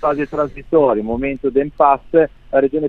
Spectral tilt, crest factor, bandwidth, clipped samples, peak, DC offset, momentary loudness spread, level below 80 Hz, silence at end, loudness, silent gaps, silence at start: -9 dB/octave; 16 dB; 4.5 kHz; under 0.1%; 0 dBFS; under 0.1%; 6 LU; -40 dBFS; 0 s; -17 LUFS; none; 0 s